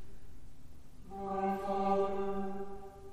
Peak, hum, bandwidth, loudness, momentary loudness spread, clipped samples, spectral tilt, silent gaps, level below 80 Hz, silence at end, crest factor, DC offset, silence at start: -20 dBFS; none; 15 kHz; -36 LUFS; 18 LU; under 0.1%; -7.5 dB/octave; none; -56 dBFS; 0 s; 16 dB; under 0.1%; 0 s